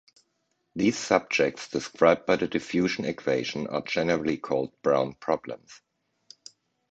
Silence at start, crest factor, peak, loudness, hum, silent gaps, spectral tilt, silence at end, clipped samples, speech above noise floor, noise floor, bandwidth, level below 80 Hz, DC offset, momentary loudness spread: 0.75 s; 22 dB; -6 dBFS; -26 LUFS; none; none; -5 dB/octave; 1.15 s; under 0.1%; 49 dB; -75 dBFS; 8.8 kHz; -62 dBFS; under 0.1%; 9 LU